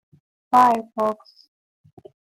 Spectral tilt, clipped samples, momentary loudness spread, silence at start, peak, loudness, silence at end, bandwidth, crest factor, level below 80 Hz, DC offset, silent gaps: -5 dB/octave; under 0.1%; 10 LU; 0.5 s; -4 dBFS; -19 LUFS; 1.15 s; 16 kHz; 18 dB; -68 dBFS; under 0.1%; none